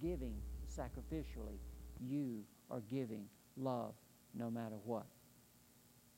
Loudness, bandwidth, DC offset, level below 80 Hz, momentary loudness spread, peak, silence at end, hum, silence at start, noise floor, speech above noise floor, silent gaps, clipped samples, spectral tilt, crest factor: -47 LUFS; 16 kHz; under 0.1%; -54 dBFS; 22 LU; -28 dBFS; 0 s; none; 0 s; -68 dBFS; 23 dB; none; under 0.1%; -7.5 dB/octave; 18 dB